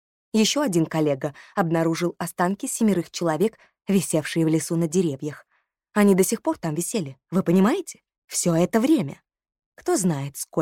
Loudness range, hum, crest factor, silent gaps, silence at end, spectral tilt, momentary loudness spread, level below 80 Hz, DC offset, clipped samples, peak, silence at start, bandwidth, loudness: 2 LU; none; 16 dB; 8.18-8.22 s, 9.66-9.72 s; 0 s; -5 dB/octave; 9 LU; -66 dBFS; under 0.1%; under 0.1%; -6 dBFS; 0.35 s; 17 kHz; -23 LUFS